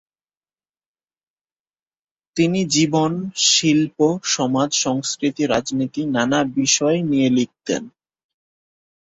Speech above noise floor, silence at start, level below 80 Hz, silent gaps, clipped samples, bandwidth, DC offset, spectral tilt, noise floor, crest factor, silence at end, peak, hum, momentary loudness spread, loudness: over 71 dB; 2.35 s; -60 dBFS; none; under 0.1%; 8.2 kHz; under 0.1%; -3.5 dB/octave; under -90 dBFS; 18 dB; 1.15 s; -2 dBFS; none; 8 LU; -19 LUFS